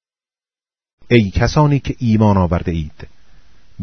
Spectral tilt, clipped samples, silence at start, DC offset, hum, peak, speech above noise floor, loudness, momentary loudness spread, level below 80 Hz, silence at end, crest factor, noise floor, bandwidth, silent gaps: -7.5 dB/octave; under 0.1%; 1.1 s; under 0.1%; none; 0 dBFS; over 75 dB; -15 LUFS; 10 LU; -32 dBFS; 0 s; 18 dB; under -90 dBFS; 6.6 kHz; none